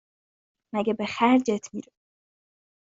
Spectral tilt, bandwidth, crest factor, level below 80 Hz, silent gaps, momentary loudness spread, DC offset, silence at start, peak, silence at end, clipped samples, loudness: -5 dB/octave; 7.8 kHz; 22 dB; -70 dBFS; none; 16 LU; under 0.1%; 0.75 s; -6 dBFS; 1.1 s; under 0.1%; -25 LUFS